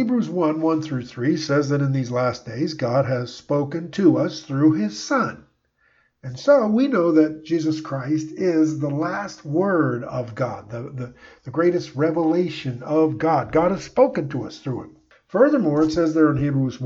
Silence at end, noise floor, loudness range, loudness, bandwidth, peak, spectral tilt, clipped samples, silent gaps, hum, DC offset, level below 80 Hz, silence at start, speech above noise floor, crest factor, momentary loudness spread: 0 s; -64 dBFS; 3 LU; -21 LUFS; 7.6 kHz; -4 dBFS; -7 dB/octave; under 0.1%; none; none; under 0.1%; -56 dBFS; 0 s; 43 dB; 18 dB; 11 LU